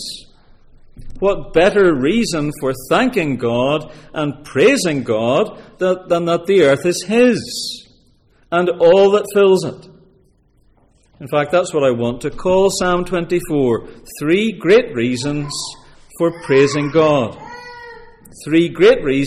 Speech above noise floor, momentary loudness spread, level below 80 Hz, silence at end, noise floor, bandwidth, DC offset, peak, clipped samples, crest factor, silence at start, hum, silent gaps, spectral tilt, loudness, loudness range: 39 dB; 12 LU; -42 dBFS; 0 s; -55 dBFS; 15.5 kHz; under 0.1%; -2 dBFS; under 0.1%; 14 dB; 0 s; none; none; -5 dB/octave; -16 LUFS; 3 LU